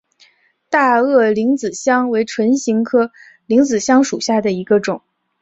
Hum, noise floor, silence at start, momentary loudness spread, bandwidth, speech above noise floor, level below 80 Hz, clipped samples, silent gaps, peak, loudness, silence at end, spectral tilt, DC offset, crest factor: none; -54 dBFS; 0.7 s; 5 LU; 8 kHz; 40 dB; -60 dBFS; under 0.1%; none; -2 dBFS; -15 LUFS; 0.45 s; -4.5 dB/octave; under 0.1%; 14 dB